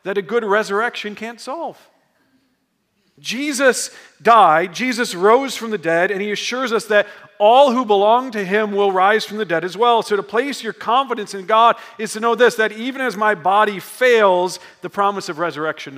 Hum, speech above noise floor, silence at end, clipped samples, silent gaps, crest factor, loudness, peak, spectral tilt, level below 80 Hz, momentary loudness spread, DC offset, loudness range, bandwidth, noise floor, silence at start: none; 50 dB; 0 s; under 0.1%; none; 18 dB; -17 LUFS; 0 dBFS; -3.5 dB/octave; -76 dBFS; 13 LU; under 0.1%; 7 LU; 16 kHz; -67 dBFS; 0.05 s